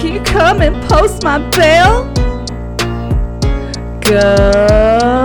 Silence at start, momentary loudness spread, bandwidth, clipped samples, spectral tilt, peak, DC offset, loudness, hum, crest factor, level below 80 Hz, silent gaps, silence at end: 0 s; 10 LU; 19.5 kHz; 0.2%; -5 dB/octave; 0 dBFS; 1%; -11 LUFS; none; 10 dB; -18 dBFS; none; 0 s